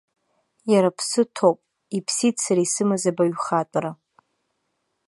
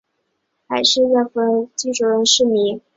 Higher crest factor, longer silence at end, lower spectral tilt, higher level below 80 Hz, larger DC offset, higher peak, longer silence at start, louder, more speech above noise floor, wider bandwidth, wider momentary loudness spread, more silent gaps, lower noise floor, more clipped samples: about the same, 18 dB vs 16 dB; first, 1.15 s vs 0.15 s; first, -4.5 dB/octave vs -2 dB/octave; second, -74 dBFS vs -62 dBFS; neither; about the same, -4 dBFS vs -2 dBFS; about the same, 0.65 s vs 0.7 s; second, -22 LUFS vs -16 LUFS; about the same, 53 dB vs 54 dB; first, 11.5 kHz vs 8 kHz; first, 10 LU vs 7 LU; neither; first, -75 dBFS vs -71 dBFS; neither